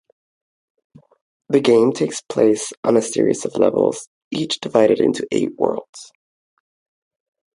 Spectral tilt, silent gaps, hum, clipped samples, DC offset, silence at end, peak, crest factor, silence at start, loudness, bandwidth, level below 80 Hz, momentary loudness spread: -5 dB/octave; 2.77-2.83 s, 4.07-4.31 s, 5.89-5.93 s; none; under 0.1%; under 0.1%; 1.5 s; 0 dBFS; 18 dB; 1.5 s; -18 LUFS; 11.5 kHz; -64 dBFS; 12 LU